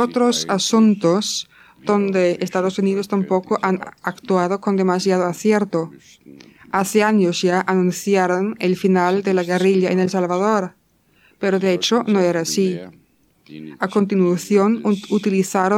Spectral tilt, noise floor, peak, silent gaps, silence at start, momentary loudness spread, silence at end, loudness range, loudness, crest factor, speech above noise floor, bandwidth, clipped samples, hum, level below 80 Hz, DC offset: -5 dB/octave; -57 dBFS; -4 dBFS; none; 0 s; 8 LU; 0 s; 3 LU; -18 LUFS; 16 dB; 39 dB; 15.5 kHz; under 0.1%; none; -66 dBFS; under 0.1%